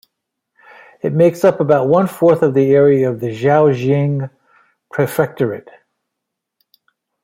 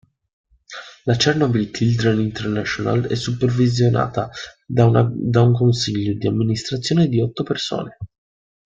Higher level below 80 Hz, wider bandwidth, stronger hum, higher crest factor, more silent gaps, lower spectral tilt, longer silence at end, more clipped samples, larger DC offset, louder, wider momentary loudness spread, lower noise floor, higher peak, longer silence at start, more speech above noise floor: second, -58 dBFS vs -50 dBFS; first, 16 kHz vs 7.6 kHz; neither; about the same, 14 dB vs 18 dB; neither; first, -8 dB/octave vs -6.5 dB/octave; first, 1.65 s vs 0.65 s; neither; neither; first, -14 LUFS vs -19 LUFS; about the same, 11 LU vs 13 LU; first, -79 dBFS vs -39 dBFS; about the same, -2 dBFS vs -2 dBFS; first, 1.05 s vs 0.7 s; first, 65 dB vs 20 dB